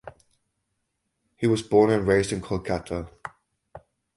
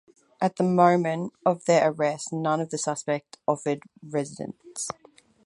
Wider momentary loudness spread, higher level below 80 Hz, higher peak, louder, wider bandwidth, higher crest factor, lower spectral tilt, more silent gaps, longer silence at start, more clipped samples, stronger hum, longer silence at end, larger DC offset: first, 19 LU vs 13 LU; first, -48 dBFS vs -72 dBFS; about the same, -6 dBFS vs -4 dBFS; about the same, -24 LUFS vs -26 LUFS; about the same, 11.5 kHz vs 11.5 kHz; about the same, 20 dB vs 22 dB; about the same, -6 dB/octave vs -5.5 dB/octave; neither; second, 0.05 s vs 0.4 s; neither; neither; second, 0.4 s vs 0.55 s; neither